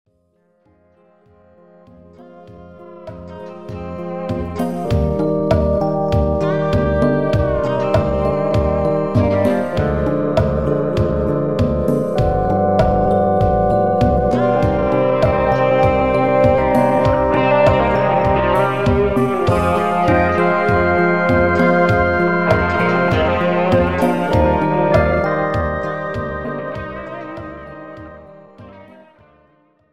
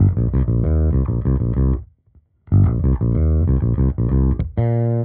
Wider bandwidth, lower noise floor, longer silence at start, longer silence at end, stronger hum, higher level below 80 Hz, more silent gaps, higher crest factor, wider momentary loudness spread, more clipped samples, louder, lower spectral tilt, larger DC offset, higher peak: first, 13.5 kHz vs 2.4 kHz; first, -60 dBFS vs -55 dBFS; first, 0.65 s vs 0 s; first, 0.45 s vs 0 s; neither; second, -30 dBFS vs -22 dBFS; neither; about the same, 14 dB vs 12 dB; first, 13 LU vs 3 LU; neither; first, -16 LUFS vs -19 LUFS; second, -8 dB/octave vs -13 dB/octave; first, 1% vs 0.2%; about the same, -2 dBFS vs -4 dBFS